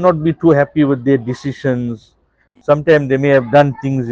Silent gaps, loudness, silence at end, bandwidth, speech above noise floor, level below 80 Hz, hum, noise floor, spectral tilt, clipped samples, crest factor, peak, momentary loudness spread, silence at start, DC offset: none; -14 LUFS; 0 s; 7.6 kHz; 41 dB; -50 dBFS; none; -55 dBFS; -8.5 dB/octave; under 0.1%; 14 dB; 0 dBFS; 10 LU; 0 s; under 0.1%